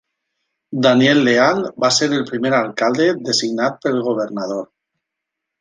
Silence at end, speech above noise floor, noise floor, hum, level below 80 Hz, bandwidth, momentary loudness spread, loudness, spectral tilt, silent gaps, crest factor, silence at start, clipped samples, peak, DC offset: 0.95 s; 64 dB; -81 dBFS; none; -62 dBFS; 9.8 kHz; 10 LU; -16 LUFS; -4 dB/octave; none; 16 dB; 0.7 s; under 0.1%; -2 dBFS; under 0.1%